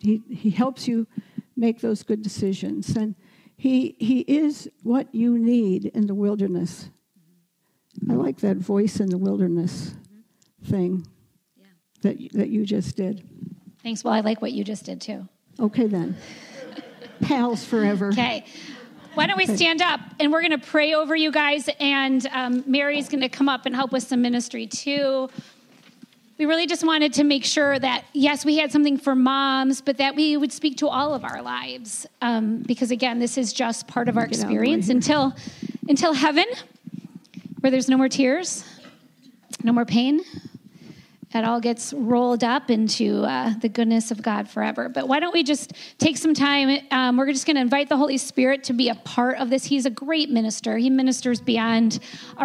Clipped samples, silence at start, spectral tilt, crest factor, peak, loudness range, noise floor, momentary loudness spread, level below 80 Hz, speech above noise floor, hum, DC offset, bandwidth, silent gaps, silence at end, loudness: under 0.1%; 0.05 s; -4.5 dB/octave; 18 dB; -4 dBFS; 6 LU; -69 dBFS; 13 LU; -66 dBFS; 47 dB; none; under 0.1%; 12.5 kHz; none; 0 s; -22 LUFS